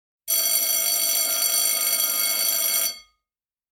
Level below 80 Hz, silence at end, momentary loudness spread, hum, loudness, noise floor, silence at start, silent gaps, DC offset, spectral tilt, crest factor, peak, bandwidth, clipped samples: -66 dBFS; 0.7 s; 4 LU; none; -19 LUFS; under -90 dBFS; 0.25 s; none; under 0.1%; 3.5 dB/octave; 18 dB; -6 dBFS; 16.5 kHz; under 0.1%